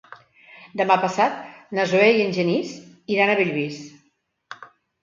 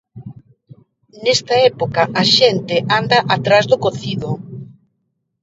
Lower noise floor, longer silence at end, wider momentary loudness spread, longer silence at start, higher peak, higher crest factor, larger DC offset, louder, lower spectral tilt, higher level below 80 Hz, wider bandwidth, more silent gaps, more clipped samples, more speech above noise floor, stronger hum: about the same, -68 dBFS vs -70 dBFS; second, 0.4 s vs 0.8 s; first, 22 LU vs 16 LU; about the same, 0.1 s vs 0.15 s; second, -4 dBFS vs 0 dBFS; about the same, 20 dB vs 18 dB; neither; second, -21 LUFS vs -15 LUFS; first, -5.5 dB/octave vs -4 dB/octave; second, -70 dBFS vs -54 dBFS; about the same, 7.6 kHz vs 7.8 kHz; neither; neither; second, 47 dB vs 55 dB; neither